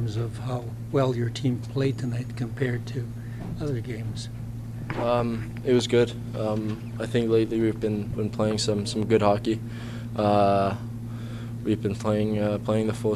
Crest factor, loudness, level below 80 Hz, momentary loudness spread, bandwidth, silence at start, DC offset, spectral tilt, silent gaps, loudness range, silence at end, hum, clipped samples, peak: 20 dB; -27 LUFS; -46 dBFS; 13 LU; 14 kHz; 0 s; under 0.1%; -6.5 dB/octave; none; 5 LU; 0 s; none; under 0.1%; -6 dBFS